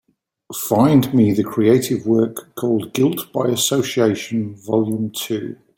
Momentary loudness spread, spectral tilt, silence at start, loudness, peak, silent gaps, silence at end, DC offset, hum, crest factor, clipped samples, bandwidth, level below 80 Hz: 11 LU; -5.5 dB/octave; 0.5 s; -18 LUFS; -2 dBFS; none; 0.25 s; under 0.1%; none; 16 dB; under 0.1%; 17 kHz; -58 dBFS